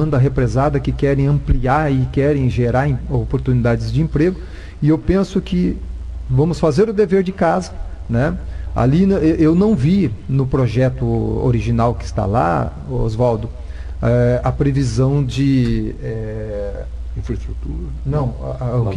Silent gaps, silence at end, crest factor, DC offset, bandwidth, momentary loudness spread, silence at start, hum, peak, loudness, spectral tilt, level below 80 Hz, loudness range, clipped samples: none; 0 s; 14 dB; under 0.1%; 10 kHz; 11 LU; 0 s; none; -2 dBFS; -17 LUFS; -8.5 dB/octave; -28 dBFS; 3 LU; under 0.1%